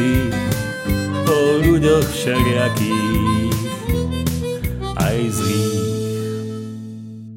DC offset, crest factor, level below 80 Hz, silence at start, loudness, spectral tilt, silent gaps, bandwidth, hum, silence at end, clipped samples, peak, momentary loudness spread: under 0.1%; 16 dB; -32 dBFS; 0 s; -19 LUFS; -6 dB/octave; none; 17 kHz; none; 0 s; under 0.1%; -2 dBFS; 11 LU